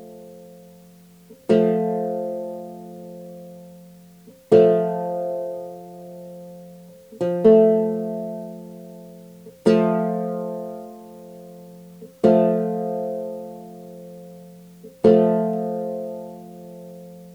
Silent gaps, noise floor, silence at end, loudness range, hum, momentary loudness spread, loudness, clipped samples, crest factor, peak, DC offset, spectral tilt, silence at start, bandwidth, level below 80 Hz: none; -49 dBFS; 0 s; 4 LU; none; 26 LU; -20 LUFS; under 0.1%; 20 dB; -2 dBFS; under 0.1%; -8.5 dB/octave; 0 s; 19.5 kHz; -66 dBFS